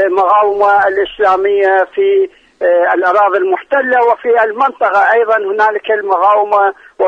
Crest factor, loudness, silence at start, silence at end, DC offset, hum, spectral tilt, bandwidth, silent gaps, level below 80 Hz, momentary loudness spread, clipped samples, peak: 10 dB; -11 LUFS; 0 s; 0 s; under 0.1%; none; -4.5 dB/octave; 7 kHz; none; -54 dBFS; 4 LU; under 0.1%; 0 dBFS